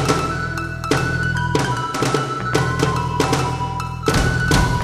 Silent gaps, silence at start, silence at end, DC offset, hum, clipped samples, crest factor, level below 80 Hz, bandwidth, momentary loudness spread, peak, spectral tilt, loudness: none; 0 s; 0 s; under 0.1%; none; under 0.1%; 18 dB; -30 dBFS; 14 kHz; 6 LU; -2 dBFS; -5 dB/octave; -20 LUFS